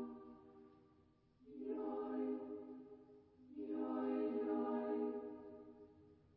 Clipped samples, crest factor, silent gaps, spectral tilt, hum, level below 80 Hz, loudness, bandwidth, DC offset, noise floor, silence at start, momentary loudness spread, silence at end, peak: under 0.1%; 16 dB; none; -6.5 dB/octave; none; -82 dBFS; -44 LUFS; 4.7 kHz; under 0.1%; -72 dBFS; 0 s; 22 LU; 0.2 s; -30 dBFS